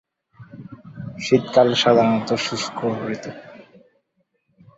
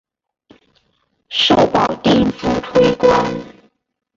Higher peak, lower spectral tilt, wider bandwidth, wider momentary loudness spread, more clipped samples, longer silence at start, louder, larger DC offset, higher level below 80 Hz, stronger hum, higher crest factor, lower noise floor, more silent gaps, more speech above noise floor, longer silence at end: about the same, -2 dBFS vs -2 dBFS; about the same, -5 dB/octave vs -5.5 dB/octave; about the same, 8 kHz vs 7.6 kHz; first, 25 LU vs 9 LU; neither; second, 0.4 s vs 1.3 s; second, -19 LUFS vs -15 LUFS; neither; second, -60 dBFS vs -42 dBFS; neither; about the same, 20 dB vs 16 dB; first, -70 dBFS vs -64 dBFS; neither; about the same, 51 dB vs 50 dB; first, 1.15 s vs 0.7 s